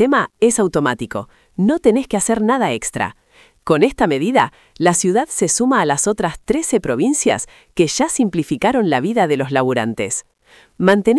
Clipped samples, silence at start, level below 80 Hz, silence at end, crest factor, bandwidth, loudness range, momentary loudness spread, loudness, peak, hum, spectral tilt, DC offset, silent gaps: under 0.1%; 0 s; -48 dBFS; 0 s; 16 dB; 12 kHz; 2 LU; 8 LU; -17 LUFS; 0 dBFS; none; -4.5 dB/octave; under 0.1%; none